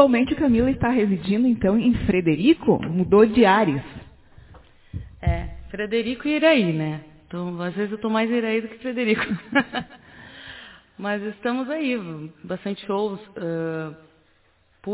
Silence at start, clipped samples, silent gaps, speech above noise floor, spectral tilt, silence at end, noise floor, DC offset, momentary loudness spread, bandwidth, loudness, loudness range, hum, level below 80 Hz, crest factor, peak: 0 s; under 0.1%; none; 40 dB; -10.5 dB/octave; 0 s; -61 dBFS; under 0.1%; 19 LU; 4 kHz; -22 LUFS; 9 LU; none; -42 dBFS; 20 dB; -2 dBFS